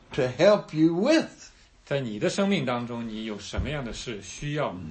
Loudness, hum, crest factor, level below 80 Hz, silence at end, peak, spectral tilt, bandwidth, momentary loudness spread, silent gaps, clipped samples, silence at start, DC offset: -26 LUFS; none; 20 dB; -46 dBFS; 0 s; -6 dBFS; -5.5 dB/octave; 8.8 kHz; 13 LU; none; under 0.1%; 0.1 s; under 0.1%